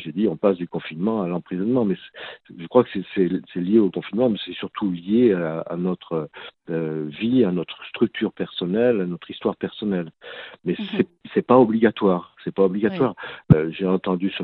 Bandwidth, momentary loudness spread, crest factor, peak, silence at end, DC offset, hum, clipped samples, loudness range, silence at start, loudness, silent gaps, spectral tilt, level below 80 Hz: 4.4 kHz; 12 LU; 22 dB; 0 dBFS; 0 s; under 0.1%; none; under 0.1%; 5 LU; 0 s; -22 LUFS; none; -11 dB/octave; -54 dBFS